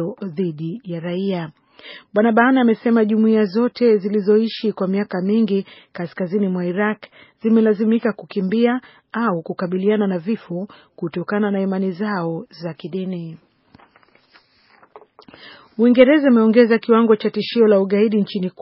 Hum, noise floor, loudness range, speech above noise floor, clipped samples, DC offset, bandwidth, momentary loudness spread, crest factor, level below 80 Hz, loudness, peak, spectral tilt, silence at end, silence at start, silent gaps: none; -55 dBFS; 9 LU; 37 dB; under 0.1%; under 0.1%; 5.8 kHz; 15 LU; 18 dB; -68 dBFS; -18 LUFS; 0 dBFS; -6 dB/octave; 0.1 s; 0 s; none